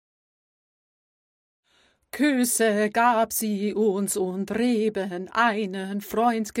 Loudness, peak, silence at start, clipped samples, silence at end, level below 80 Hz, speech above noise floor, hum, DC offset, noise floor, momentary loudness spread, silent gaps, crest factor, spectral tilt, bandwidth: -24 LUFS; -8 dBFS; 2.15 s; under 0.1%; 0 s; -64 dBFS; 41 dB; none; under 0.1%; -64 dBFS; 8 LU; none; 18 dB; -4 dB/octave; 16.5 kHz